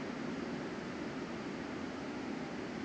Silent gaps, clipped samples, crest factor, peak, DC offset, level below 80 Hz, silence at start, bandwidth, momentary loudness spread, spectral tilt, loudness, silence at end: none; under 0.1%; 12 dB; -30 dBFS; under 0.1%; -66 dBFS; 0 s; 9.4 kHz; 1 LU; -5.5 dB/octave; -42 LUFS; 0 s